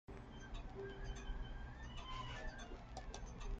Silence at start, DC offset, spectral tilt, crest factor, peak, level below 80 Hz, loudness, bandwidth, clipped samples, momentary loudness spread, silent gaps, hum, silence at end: 0.1 s; under 0.1%; -4.5 dB/octave; 14 dB; -34 dBFS; -50 dBFS; -52 LUFS; 8.8 kHz; under 0.1%; 5 LU; none; none; 0 s